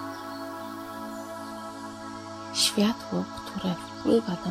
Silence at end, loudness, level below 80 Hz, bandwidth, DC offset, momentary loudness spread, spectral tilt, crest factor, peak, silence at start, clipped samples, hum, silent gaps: 0 s; -30 LUFS; -62 dBFS; 16 kHz; under 0.1%; 15 LU; -4 dB/octave; 20 dB; -10 dBFS; 0 s; under 0.1%; none; none